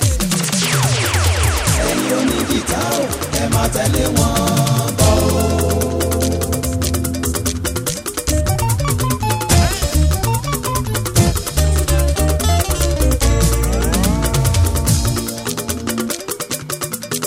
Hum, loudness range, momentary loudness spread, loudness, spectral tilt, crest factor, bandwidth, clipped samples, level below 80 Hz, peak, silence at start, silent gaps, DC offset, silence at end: none; 2 LU; 6 LU; -17 LUFS; -4.5 dB/octave; 16 dB; 16.5 kHz; under 0.1%; -22 dBFS; 0 dBFS; 0 s; none; under 0.1%; 0 s